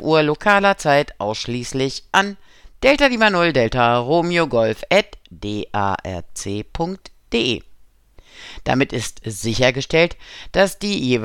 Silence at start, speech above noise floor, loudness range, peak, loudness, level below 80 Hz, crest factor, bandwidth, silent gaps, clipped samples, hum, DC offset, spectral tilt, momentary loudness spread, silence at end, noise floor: 0 s; 29 dB; 7 LU; -2 dBFS; -19 LUFS; -42 dBFS; 18 dB; 17 kHz; none; under 0.1%; none; under 0.1%; -4.5 dB/octave; 13 LU; 0 s; -48 dBFS